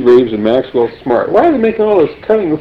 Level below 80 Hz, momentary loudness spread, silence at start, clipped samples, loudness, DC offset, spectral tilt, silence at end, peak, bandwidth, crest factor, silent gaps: -44 dBFS; 5 LU; 0 s; under 0.1%; -12 LUFS; under 0.1%; -8.5 dB/octave; 0 s; 0 dBFS; 5.4 kHz; 10 dB; none